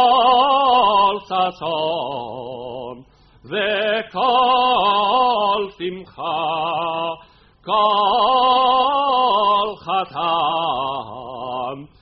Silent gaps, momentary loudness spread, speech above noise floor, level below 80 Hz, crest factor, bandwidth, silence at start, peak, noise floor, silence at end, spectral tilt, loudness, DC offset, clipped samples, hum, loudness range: none; 15 LU; 26 dB; -54 dBFS; 16 dB; 5.8 kHz; 0 s; -2 dBFS; -46 dBFS; 0.15 s; -0.5 dB/octave; -18 LUFS; under 0.1%; under 0.1%; none; 4 LU